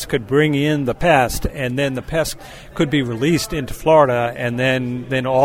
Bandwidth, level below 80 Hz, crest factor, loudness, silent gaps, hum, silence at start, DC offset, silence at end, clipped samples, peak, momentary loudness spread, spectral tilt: 16.5 kHz; -36 dBFS; 18 dB; -18 LUFS; none; none; 0 s; under 0.1%; 0 s; under 0.1%; 0 dBFS; 8 LU; -5.5 dB/octave